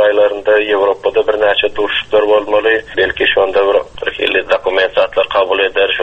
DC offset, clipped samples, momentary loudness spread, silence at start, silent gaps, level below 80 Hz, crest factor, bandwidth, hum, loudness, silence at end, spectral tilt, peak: under 0.1%; under 0.1%; 3 LU; 0 s; none; -44 dBFS; 12 dB; 7.8 kHz; none; -13 LUFS; 0 s; -4.5 dB/octave; 0 dBFS